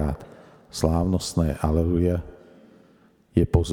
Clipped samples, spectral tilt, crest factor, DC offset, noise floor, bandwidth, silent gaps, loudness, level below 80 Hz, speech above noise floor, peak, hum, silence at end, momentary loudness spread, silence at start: under 0.1%; -7 dB/octave; 20 dB; under 0.1%; -57 dBFS; 16 kHz; none; -24 LUFS; -36 dBFS; 35 dB; -4 dBFS; none; 0 s; 12 LU; 0 s